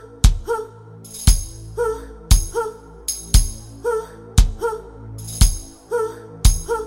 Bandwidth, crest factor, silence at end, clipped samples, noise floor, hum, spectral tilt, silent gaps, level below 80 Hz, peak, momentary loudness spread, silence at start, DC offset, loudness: 16.5 kHz; 20 dB; 0 s; under 0.1%; -39 dBFS; none; -4 dB/octave; none; -20 dBFS; 0 dBFS; 14 LU; 0.05 s; under 0.1%; -22 LUFS